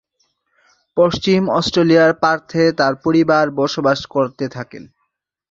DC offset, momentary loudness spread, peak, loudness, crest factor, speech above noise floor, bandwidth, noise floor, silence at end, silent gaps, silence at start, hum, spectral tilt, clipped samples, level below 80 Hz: under 0.1%; 13 LU; -2 dBFS; -16 LUFS; 16 dB; 57 dB; 7.8 kHz; -72 dBFS; 0.7 s; none; 0.95 s; none; -6 dB/octave; under 0.1%; -52 dBFS